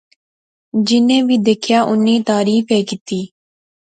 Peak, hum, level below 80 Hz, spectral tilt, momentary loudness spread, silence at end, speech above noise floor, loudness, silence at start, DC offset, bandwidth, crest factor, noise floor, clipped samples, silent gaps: -2 dBFS; none; -62 dBFS; -5 dB/octave; 11 LU; 0.75 s; over 76 dB; -15 LUFS; 0.75 s; under 0.1%; 9.2 kHz; 14 dB; under -90 dBFS; under 0.1%; 3.01-3.06 s